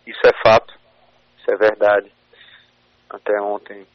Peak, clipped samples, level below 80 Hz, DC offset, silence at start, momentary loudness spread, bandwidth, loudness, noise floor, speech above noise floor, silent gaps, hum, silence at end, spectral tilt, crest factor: -2 dBFS; under 0.1%; -52 dBFS; under 0.1%; 0.05 s; 15 LU; 6.4 kHz; -17 LUFS; -57 dBFS; 39 dB; none; 60 Hz at -65 dBFS; 0.15 s; -2 dB/octave; 16 dB